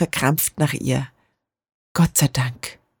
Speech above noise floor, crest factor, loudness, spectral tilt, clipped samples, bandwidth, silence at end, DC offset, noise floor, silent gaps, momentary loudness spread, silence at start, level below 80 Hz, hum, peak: 50 dB; 18 dB; -21 LUFS; -4.5 dB/octave; under 0.1%; over 20 kHz; 0.25 s; under 0.1%; -70 dBFS; 1.74-1.95 s; 16 LU; 0 s; -48 dBFS; none; -4 dBFS